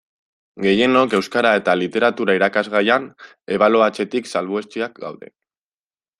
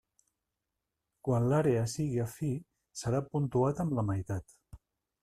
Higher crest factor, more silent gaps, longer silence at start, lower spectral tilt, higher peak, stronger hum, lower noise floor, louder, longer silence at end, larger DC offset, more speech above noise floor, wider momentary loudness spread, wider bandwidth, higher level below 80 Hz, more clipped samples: about the same, 18 dB vs 18 dB; neither; second, 0.55 s vs 1.25 s; second, -5 dB/octave vs -7.5 dB/octave; first, -2 dBFS vs -16 dBFS; neither; about the same, under -90 dBFS vs -87 dBFS; first, -18 LUFS vs -32 LUFS; first, 1.05 s vs 0.45 s; neither; first, over 72 dB vs 56 dB; about the same, 12 LU vs 12 LU; second, 12 kHz vs 14 kHz; about the same, -62 dBFS vs -58 dBFS; neither